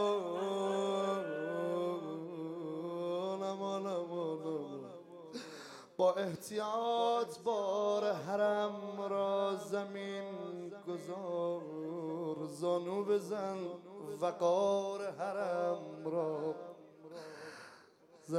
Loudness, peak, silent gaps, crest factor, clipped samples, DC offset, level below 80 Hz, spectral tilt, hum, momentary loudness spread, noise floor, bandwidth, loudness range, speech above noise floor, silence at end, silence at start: -37 LUFS; -20 dBFS; none; 18 dB; under 0.1%; under 0.1%; under -90 dBFS; -5.5 dB/octave; none; 15 LU; -62 dBFS; 15 kHz; 5 LU; 26 dB; 0 s; 0 s